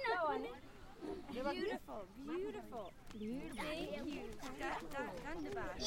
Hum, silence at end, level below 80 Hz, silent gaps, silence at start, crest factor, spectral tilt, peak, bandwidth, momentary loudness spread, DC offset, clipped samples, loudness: none; 0 s; -60 dBFS; none; 0 s; 16 dB; -4.5 dB/octave; -28 dBFS; 16.5 kHz; 10 LU; under 0.1%; under 0.1%; -45 LUFS